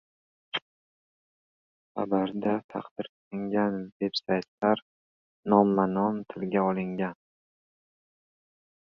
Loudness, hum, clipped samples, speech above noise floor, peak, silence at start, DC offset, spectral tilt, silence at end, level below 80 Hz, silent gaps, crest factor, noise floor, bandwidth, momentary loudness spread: -29 LUFS; none; under 0.1%; over 63 dB; -6 dBFS; 0.55 s; under 0.1%; -7.5 dB/octave; 1.75 s; -68 dBFS; 0.62-1.95 s, 2.64-2.69 s, 2.91-2.96 s, 3.09-3.31 s, 3.92-4.00 s, 4.48-4.58 s, 4.82-5.43 s; 24 dB; under -90 dBFS; 6.6 kHz; 13 LU